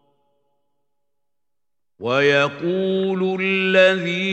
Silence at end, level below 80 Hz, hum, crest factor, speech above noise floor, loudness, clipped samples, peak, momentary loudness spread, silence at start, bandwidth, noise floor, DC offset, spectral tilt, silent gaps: 0 s; -72 dBFS; none; 20 dB; 68 dB; -18 LUFS; under 0.1%; -2 dBFS; 8 LU; 2 s; 8.6 kHz; -87 dBFS; under 0.1%; -5.5 dB/octave; none